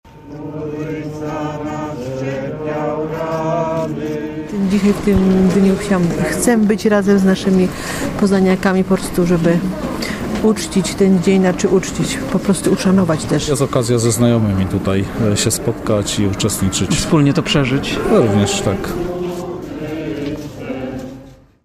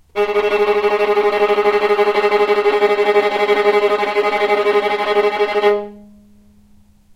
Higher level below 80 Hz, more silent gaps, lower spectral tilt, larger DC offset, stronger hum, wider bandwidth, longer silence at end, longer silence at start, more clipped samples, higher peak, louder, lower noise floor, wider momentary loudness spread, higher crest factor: first, -36 dBFS vs -54 dBFS; neither; first, -5.5 dB/octave vs -4 dB/octave; neither; neither; first, 15.5 kHz vs 12.5 kHz; second, 0.3 s vs 1.15 s; about the same, 0.05 s vs 0.15 s; neither; about the same, -2 dBFS vs -2 dBFS; about the same, -16 LUFS vs -15 LUFS; second, -39 dBFS vs -48 dBFS; first, 11 LU vs 2 LU; about the same, 14 dB vs 14 dB